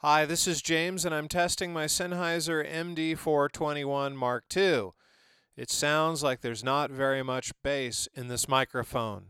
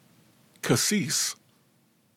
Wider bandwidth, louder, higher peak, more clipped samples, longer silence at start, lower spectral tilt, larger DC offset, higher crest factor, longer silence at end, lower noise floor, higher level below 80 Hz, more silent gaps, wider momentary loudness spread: about the same, 17.5 kHz vs 17 kHz; second, -29 LUFS vs -25 LUFS; about the same, -10 dBFS vs -10 dBFS; neither; second, 0.05 s vs 0.65 s; about the same, -3 dB/octave vs -3 dB/octave; neither; about the same, 20 dB vs 20 dB; second, 0 s vs 0.85 s; about the same, -65 dBFS vs -65 dBFS; first, -58 dBFS vs -70 dBFS; neither; second, 6 LU vs 13 LU